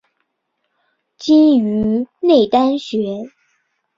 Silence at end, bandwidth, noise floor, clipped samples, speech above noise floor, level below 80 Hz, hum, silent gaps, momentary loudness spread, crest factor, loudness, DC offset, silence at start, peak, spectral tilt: 0.7 s; 7.6 kHz; -72 dBFS; under 0.1%; 58 dB; -54 dBFS; none; none; 15 LU; 14 dB; -15 LUFS; under 0.1%; 1.2 s; -2 dBFS; -7 dB/octave